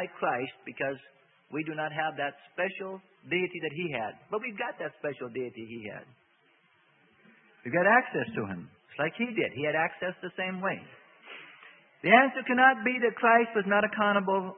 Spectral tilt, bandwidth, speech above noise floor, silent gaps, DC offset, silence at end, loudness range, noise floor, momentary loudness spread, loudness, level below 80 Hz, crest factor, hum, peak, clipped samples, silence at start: -9 dB/octave; 4.4 kHz; 37 dB; none; under 0.1%; 0 s; 12 LU; -66 dBFS; 19 LU; -28 LUFS; -76 dBFS; 26 dB; none; -4 dBFS; under 0.1%; 0 s